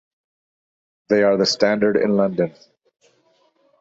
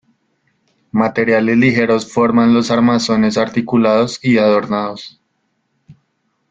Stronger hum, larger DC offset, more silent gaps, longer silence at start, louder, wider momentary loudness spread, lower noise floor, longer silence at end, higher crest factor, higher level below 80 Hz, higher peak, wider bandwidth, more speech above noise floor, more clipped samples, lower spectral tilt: neither; neither; neither; first, 1.1 s vs 0.95 s; second, -18 LUFS vs -14 LUFS; about the same, 6 LU vs 8 LU; second, -61 dBFS vs -67 dBFS; first, 1.3 s vs 0.6 s; first, 20 dB vs 14 dB; second, -62 dBFS vs -54 dBFS; about the same, -2 dBFS vs 0 dBFS; about the same, 8 kHz vs 7.8 kHz; second, 43 dB vs 53 dB; neither; about the same, -5 dB/octave vs -6 dB/octave